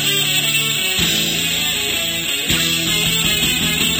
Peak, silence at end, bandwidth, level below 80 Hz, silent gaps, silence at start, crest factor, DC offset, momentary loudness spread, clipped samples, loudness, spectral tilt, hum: -4 dBFS; 0 s; over 20 kHz; -40 dBFS; none; 0 s; 14 dB; under 0.1%; 3 LU; under 0.1%; -15 LUFS; -1.5 dB/octave; none